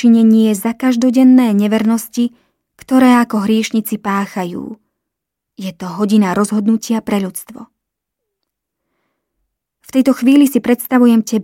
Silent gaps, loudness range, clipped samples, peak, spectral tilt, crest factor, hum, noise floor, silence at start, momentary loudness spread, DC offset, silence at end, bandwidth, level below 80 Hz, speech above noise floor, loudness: none; 8 LU; under 0.1%; -2 dBFS; -5.5 dB/octave; 14 dB; none; -79 dBFS; 0 s; 15 LU; under 0.1%; 0 s; 16.5 kHz; -58 dBFS; 67 dB; -13 LUFS